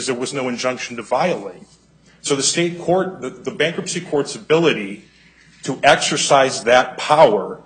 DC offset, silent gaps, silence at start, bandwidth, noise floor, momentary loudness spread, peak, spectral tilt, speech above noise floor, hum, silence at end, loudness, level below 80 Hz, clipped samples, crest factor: under 0.1%; none; 0 s; 9.6 kHz; -50 dBFS; 14 LU; 0 dBFS; -3 dB/octave; 32 dB; none; 0.05 s; -17 LUFS; -58 dBFS; under 0.1%; 18 dB